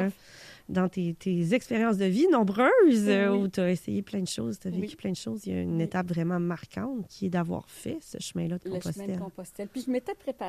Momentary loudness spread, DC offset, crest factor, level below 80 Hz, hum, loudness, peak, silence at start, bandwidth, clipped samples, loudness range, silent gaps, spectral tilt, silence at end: 14 LU; under 0.1%; 18 dB; -62 dBFS; none; -28 LUFS; -10 dBFS; 0 s; 14.5 kHz; under 0.1%; 9 LU; none; -6.5 dB/octave; 0 s